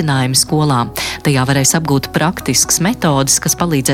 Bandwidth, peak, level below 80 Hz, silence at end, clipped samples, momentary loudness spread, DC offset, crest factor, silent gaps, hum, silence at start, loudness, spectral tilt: 17 kHz; 0 dBFS; -38 dBFS; 0 s; under 0.1%; 5 LU; under 0.1%; 14 dB; none; none; 0 s; -13 LUFS; -3.5 dB/octave